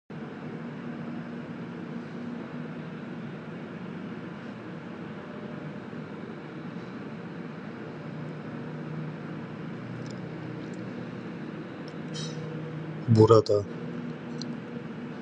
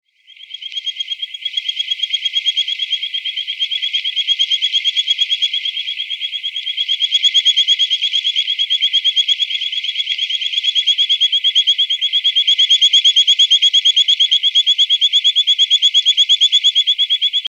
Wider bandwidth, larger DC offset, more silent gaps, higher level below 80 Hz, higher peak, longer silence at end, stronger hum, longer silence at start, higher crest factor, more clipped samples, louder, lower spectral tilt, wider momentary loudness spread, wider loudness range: second, 9.2 kHz vs 10.5 kHz; neither; neither; first, -64 dBFS vs -88 dBFS; about the same, -4 dBFS vs -2 dBFS; about the same, 0 s vs 0 s; neither; second, 0.1 s vs 0.4 s; first, 28 dB vs 14 dB; neither; second, -33 LUFS vs -12 LUFS; first, -7.5 dB/octave vs 9 dB/octave; second, 8 LU vs 11 LU; first, 13 LU vs 7 LU